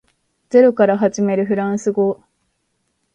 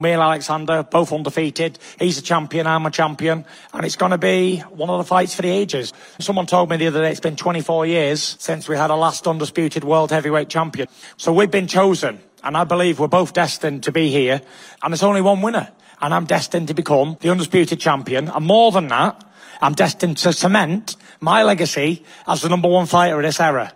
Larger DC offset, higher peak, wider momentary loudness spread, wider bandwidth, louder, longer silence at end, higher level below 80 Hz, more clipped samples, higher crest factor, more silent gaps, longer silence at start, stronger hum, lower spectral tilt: neither; about the same, 0 dBFS vs 0 dBFS; about the same, 7 LU vs 9 LU; second, 9.2 kHz vs 16 kHz; about the same, -16 LUFS vs -18 LUFS; first, 1 s vs 0.05 s; about the same, -62 dBFS vs -64 dBFS; neither; about the same, 16 dB vs 18 dB; neither; first, 0.55 s vs 0 s; neither; first, -7 dB/octave vs -5 dB/octave